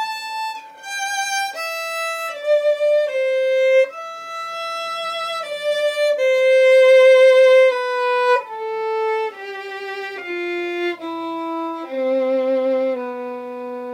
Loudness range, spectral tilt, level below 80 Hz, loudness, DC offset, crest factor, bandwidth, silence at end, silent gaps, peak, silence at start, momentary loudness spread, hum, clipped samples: 10 LU; -1 dB/octave; under -90 dBFS; -18 LUFS; under 0.1%; 14 dB; 16 kHz; 0 s; none; -4 dBFS; 0 s; 17 LU; none; under 0.1%